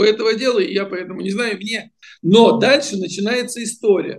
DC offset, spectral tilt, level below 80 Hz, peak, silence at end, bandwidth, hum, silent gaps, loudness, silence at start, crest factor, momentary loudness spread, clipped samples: under 0.1%; -4.5 dB/octave; -66 dBFS; 0 dBFS; 0 s; 12.5 kHz; none; none; -17 LUFS; 0 s; 16 dB; 13 LU; under 0.1%